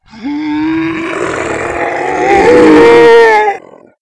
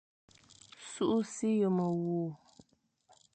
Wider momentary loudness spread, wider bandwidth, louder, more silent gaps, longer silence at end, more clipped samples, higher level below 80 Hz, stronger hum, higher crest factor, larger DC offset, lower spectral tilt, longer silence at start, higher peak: second, 12 LU vs 18 LU; first, 11 kHz vs 9.2 kHz; first, -8 LUFS vs -33 LUFS; neither; second, 0.45 s vs 1 s; first, 6% vs under 0.1%; first, -38 dBFS vs -76 dBFS; neither; second, 8 dB vs 16 dB; neither; second, -5 dB/octave vs -6.5 dB/octave; second, 0.15 s vs 0.8 s; first, 0 dBFS vs -20 dBFS